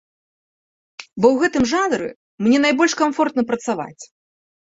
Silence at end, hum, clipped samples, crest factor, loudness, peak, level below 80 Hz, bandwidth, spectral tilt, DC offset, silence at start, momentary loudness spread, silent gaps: 0.65 s; none; under 0.1%; 18 dB; -18 LUFS; -2 dBFS; -54 dBFS; 8 kHz; -4 dB/octave; under 0.1%; 1 s; 15 LU; 2.16-2.38 s